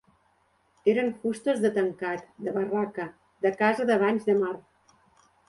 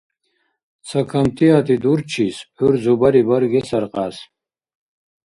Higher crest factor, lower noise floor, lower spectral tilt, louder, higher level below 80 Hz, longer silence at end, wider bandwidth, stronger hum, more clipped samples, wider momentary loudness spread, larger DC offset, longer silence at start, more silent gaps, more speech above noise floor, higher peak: about the same, 18 dB vs 18 dB; about the same, -67 dBFS vs -68 dBFS; about the same, -6 dB/octave vs -7 dB/octave; second, -27 LUFS vs -17 LUFS; second, -72 dBFS vs -52 dBFS; about the same, 0.9 s vs 1 s; about the same, 11.5 kHz vs 11.5 kHz; neither; neither; about the same, 9 LU vs 10 LU; neither; about the same, 0.85 s vs 0.85 s; neither; second, 42 dB vs 52 dB; second, -10 dBFS vs -2 dBFS